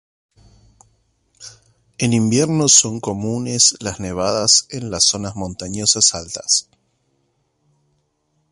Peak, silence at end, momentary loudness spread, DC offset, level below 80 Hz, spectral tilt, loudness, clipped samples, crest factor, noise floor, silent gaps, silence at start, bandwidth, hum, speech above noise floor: 0 dBFS; 1.9 s; 15 LU; under 0.1%; -48 dBFS; -2.5 dB/octave; -16 LUFS; under 0.1%; 20 dB; -67 dBFS; none; 1.4 s; 14 kHz; none; 49 dB